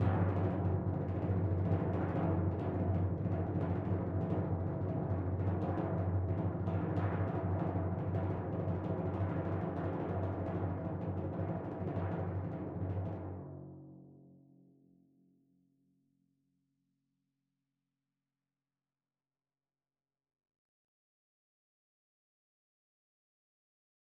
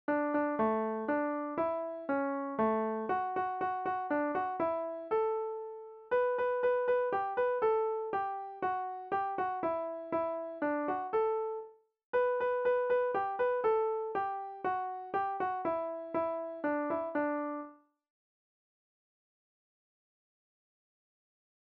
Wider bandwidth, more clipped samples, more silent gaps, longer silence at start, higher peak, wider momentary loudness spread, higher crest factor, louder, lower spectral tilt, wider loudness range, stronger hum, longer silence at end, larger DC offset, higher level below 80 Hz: second, 3.8 kHz vs 5.2 kHz; neither; second, none vs 12.04-12.13 s; about the same, 0 s vs 0.1 s; about the same, -20 dBFS vs -20 dBFS; about the same, 5 LU vs 7 LU; about the same, 18 dB vs 14 dB; second, -37 LUFS vs -34 LUFS; first, -11.5 dB/octave vs -4.5 dB/octave; first, 8 LU vs 5 LU; neither; first, 9.85 s vs 3.95 s; neither; first, -60 dBFS vs -74 dBFS